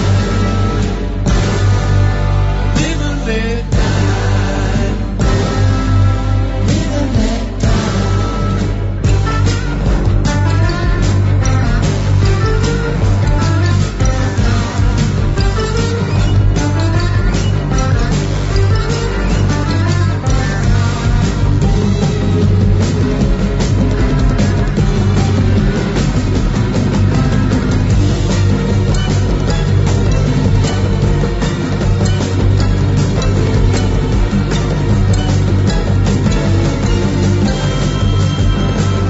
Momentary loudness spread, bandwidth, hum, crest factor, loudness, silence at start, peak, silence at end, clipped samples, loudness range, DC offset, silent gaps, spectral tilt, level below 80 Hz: 3 LU; 8 kHz; none; 10 dB; -14 LUFS; 0 s; -2 dBFS; 0 s; under 0.1%; 1 LU; under 0.1%; none; -6.5 dB/octave; -18 dBFS